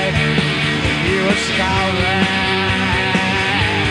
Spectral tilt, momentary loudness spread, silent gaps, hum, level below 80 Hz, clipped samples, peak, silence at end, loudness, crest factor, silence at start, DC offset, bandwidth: -4.5 dB/octave; 1 LU; none; none; -34 dBFS; under 0.1%; -2 dBFS; 0 s; -15 LUFS; 16 dB; 0 s; under 0.1%; 12 kHz